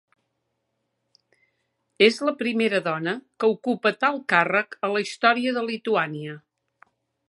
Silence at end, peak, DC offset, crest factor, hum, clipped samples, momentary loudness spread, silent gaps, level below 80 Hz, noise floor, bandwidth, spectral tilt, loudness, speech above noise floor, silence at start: 0.9 s; -2 dBFS; under 0.1%; 22 dB; none; under 0.1%; 9 LU; none; -80 dBFS; -77 dBFS; 11.5 kHz; -4.5 dB/octave; -23 LUFS; 54 dB; 2 s